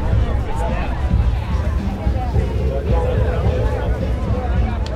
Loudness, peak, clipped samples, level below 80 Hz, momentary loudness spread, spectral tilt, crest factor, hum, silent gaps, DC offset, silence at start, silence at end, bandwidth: -20 LUFS; -4 dBFS; under 0.1%; -20 dBFS; 3 LU; -8 dB/octave; 14 dB; none; none; under 0.1%; 0 s; 0 s; 8.6 kHz